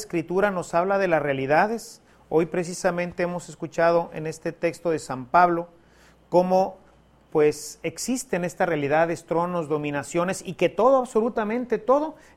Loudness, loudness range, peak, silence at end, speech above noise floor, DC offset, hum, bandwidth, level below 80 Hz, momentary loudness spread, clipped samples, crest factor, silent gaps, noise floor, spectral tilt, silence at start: -24 LUFS; 2 LU; -4 dBFS; 0.25 s; 32 dB; under 0.1%; none; 15 kHz; -58 dBFS; 9 LU; under 0.1%; 20 dB; none; -56 dBFS; -5.5 dB/octave; 0 s